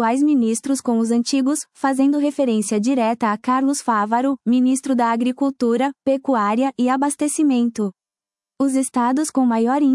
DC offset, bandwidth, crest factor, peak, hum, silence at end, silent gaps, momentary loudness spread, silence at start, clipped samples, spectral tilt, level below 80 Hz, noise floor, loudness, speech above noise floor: under 0.1%; 12 kHz; 12 dB; -6 dBFS; none; 0 s; none; 4 LU; 0 s; under 0.1%; -4.5 dB/octave; -70 dBFS; under -90 dBFS; -19 LUFS; over 72 dB